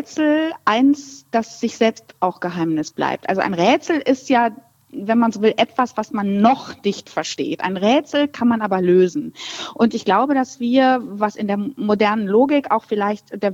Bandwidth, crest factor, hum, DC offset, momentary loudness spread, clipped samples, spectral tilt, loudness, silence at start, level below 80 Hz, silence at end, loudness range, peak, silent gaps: 8 kHz; 18 dB; none; under 0.1%; 8 LU; under 0.1%; -5.5 dB/octave; -19 LUFS; 0 s; -66 dBFS; 0 s; 2 LU; -2 dBFS; none